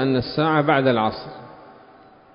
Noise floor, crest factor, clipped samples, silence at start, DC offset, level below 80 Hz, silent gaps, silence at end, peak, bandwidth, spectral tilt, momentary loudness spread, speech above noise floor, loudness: -49 dBFS; 18 dB; under 0.1%; 0 s; under 0.1%; -54 dBFS; none; 0.65 s; -4 dBFS; 5.4 kHz; -11 dB/octave; 20 LU; 29 dB; -20 LUFS